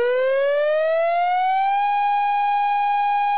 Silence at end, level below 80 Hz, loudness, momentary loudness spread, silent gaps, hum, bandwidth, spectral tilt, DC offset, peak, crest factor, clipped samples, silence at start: 0 s; -76 dBFS; -20 LUFS; 0 LU; none; none; 4 kHz; -3.5 dB/octave; 0.9%; -14 dBFS; 4 dB; under 0.1%; 0 s